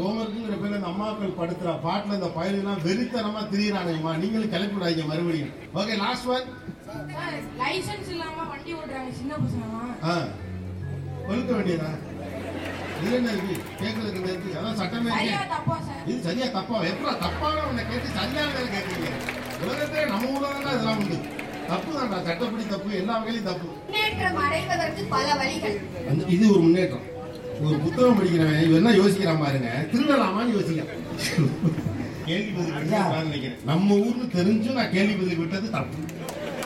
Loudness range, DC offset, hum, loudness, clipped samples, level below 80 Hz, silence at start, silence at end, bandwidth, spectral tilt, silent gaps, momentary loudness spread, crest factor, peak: 8 LU; under 0.1%; none; -26 LUFS; under 0.1%; -54 dBFS; 0 s; 0 s; 16.5 kHz; -6 dB/octave; none; 12 LU; 18 dB; -6 dBFS